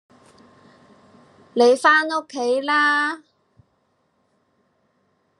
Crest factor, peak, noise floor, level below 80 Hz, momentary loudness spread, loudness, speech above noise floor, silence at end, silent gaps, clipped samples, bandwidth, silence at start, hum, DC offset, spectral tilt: 20 dB; -2 dBFS; -67 dBFS; -80 dBFS; 11 LU; -18 LUFS; 49 dB; 2.2 s; none; under 0.1%; 11.5 kHz; 1.55 s; none; under 0.1%; -2 dB/octave